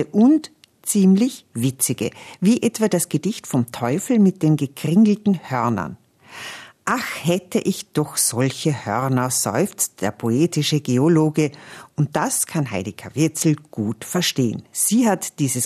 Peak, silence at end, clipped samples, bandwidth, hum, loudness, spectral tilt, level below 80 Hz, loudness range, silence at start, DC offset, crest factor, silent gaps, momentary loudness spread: -6 dBFS; 0 s; under 0.1%; 14 kHz; none; -20 LUFS; -5 dB/octave; -62 dBFS; 3 LU; 0 s; under 0.1%; 14 dB; none; 10 LU